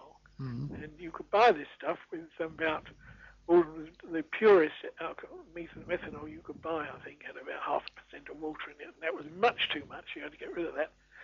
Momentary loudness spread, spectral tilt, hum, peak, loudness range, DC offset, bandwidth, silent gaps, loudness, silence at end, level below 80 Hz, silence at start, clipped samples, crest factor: 20 LU; -3 dB/octave; none; -14 dBFS; 9 LU; under 0.1%; 7 kHz; none; -32 LUFS; 0 s; -64 dBFS; 0 s; under 0.1%; 20 dB